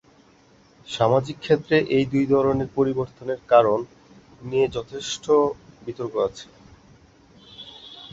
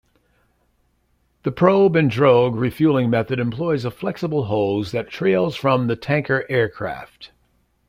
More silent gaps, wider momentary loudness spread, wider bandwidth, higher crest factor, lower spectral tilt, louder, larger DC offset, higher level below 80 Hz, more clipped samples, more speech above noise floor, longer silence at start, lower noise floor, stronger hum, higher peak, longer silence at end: neither; first, 21 LU vs 11 LU; second, 8 kHz vs 15.5 kHz; about the same, 20 dB vs 18 dB; second, -6 dB/octave vs -8 dB/octave; second, -22 LUFS vs -19 LUFS; neither; about the same, -54 dBFS vs -54 dBFS; neither; second, 33 dB vs 46 dB; second, 0.9 s vs 1.45 s; second, -55 dBFS vs -65 dBFS; second, none vs 60 Hz at -45 dBFS; about the same, -4 dBFS vs -2 dBFS; second, 0.05 s vs 0.65 s